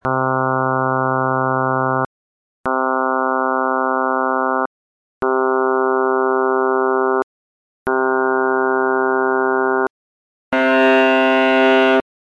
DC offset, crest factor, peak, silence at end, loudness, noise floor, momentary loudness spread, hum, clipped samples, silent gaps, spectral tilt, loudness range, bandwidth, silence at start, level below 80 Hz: under 0.1%; 14 dB; -2 dBFS; 0.3 s; -17 LUFS; under -90 dBFS; 9 LU; none; under 0.1%; 2.06-2.64 s, 4.66-5.21 s, 7.23-7.86 s, 9.90-10.52 s; -7 dB/octave; 3 LU; 7.2 kHz; 0.05 s; -58 dBFS